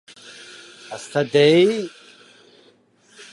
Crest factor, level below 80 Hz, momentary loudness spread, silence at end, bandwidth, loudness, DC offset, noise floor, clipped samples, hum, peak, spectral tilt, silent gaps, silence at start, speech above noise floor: 20 dB; -74 dBFS; 26 LU; 1.45 s; 11.5 kHz; -17 LUFS; under 0.1%; -56 dBFS; under 0.1%; none; -2 dBFS; -5.5 dB/octave; none; 0.9 s; 39 dB